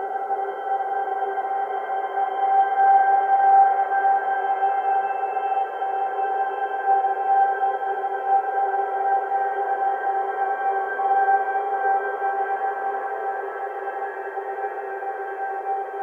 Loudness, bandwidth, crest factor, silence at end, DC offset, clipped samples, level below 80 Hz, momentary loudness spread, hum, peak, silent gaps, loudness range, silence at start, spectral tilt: -23 LUFS; 3.4 kHz; 14 dB; 0 s; under 0.1%; under 0.1%; under -90 dBFS; 11 LU; none; -8 dBFS; none; 7 LU; 0 s; -3.5 dB/octave